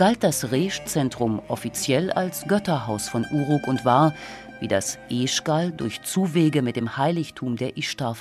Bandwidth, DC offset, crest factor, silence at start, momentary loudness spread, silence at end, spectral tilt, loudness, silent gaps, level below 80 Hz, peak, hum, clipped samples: 15 kHz; under 0.1%; 18 dB; 0 s; 8 LU; 0 s; -5 dB/octave; -24 LUFS; none; -56 dBFS; -6 dBFS; none; under 0.1%